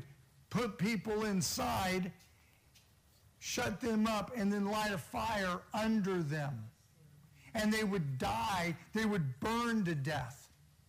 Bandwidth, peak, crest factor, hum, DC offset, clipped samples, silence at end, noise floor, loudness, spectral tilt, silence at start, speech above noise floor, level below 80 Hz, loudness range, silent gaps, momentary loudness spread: 15.5 kHz; -24 dBFS; 14 dB; none; under 0.1%; under 0.1%; 0.45 s; -66 dBFS; -36 LUFS; -5 dB/octave; 0 s; 31 dB; -60 dBFS; 2 LU; none; 8 LU